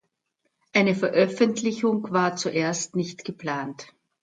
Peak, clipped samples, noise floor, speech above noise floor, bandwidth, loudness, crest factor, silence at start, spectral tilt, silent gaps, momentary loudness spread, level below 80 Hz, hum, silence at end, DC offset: -6 dBFS; under 0.1%; -76 dBFS; 52 dB; 9.6 kHz; -24 LUFS; 18 dB; 0.75 s; -4.5 dB/octave; none; 11 LU; -72 dBFS; none; 0.35 s; under 0.1%